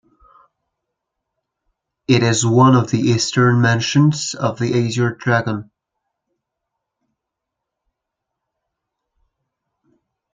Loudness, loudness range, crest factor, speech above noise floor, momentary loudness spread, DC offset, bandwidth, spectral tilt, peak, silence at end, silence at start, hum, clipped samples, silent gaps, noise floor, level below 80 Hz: -16 LUFS; 10 LU; 18 dB; 66 dB; 8 LU; under 0.1%; 9.4 kHz; -5.5 dB/octave; -2 dBFS; 4.7 s; 2.1 s; none; under 0.1%; none; -81 dBFS; -58 dBFS